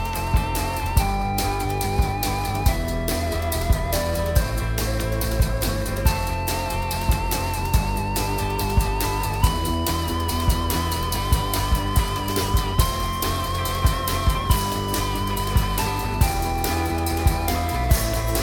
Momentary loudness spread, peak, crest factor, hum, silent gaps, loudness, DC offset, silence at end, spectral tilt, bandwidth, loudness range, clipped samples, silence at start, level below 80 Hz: 3 LU; -4 dBFS; 18 dB; none; none; -23 LUFS; under 0.1%; 0 s; -4.5 dB/octave; 18 kHz; 1 LU; under 0.1%; 0 s; -26 dBFS